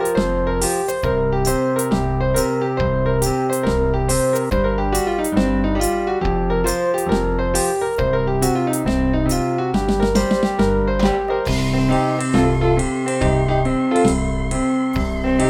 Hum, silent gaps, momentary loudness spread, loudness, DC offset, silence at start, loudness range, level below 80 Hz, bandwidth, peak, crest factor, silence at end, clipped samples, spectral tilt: none; none; 3 LU; -19 LUFS; under 0.1%; 0 s; 1 LU; -26 dBFS; 19 kHz; -4 dBFS; 14 dB; 0 s; under 0.1%; -6 dB/octave